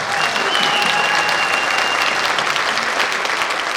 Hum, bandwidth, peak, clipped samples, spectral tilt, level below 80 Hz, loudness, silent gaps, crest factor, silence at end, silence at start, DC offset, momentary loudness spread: none; over 20 kHz; -4 dBFS; under 0.1%; -0.5 dB/octave; -58 dBFS; -16 LUFS; none; 14 dB; 0 s; 0 s; under 0.1%; 3 LU